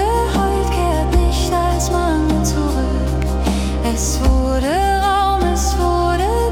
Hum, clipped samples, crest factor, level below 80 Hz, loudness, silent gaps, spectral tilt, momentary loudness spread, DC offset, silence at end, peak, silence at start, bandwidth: none; under 0.1%; 12 dB; -20 dBFS; -17 LUFS; none; -5.5 dB/octave; 3 LU; under 0.1%; 0 s; -4 dBFS; 0 s; 16.5 kHz